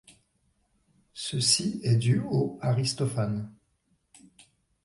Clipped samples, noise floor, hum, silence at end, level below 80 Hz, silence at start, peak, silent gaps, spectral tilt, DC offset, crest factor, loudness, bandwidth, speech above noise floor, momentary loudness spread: under 0.1%; -72 dBFS; none; 1.35 s; -62 dBFS; 1.15 s; -10 dBFS; none; -4.5 dB/octave; under 0.1%; 20 dB; -27 LUFS; 11.5 kHz; 46 dB; 13 LU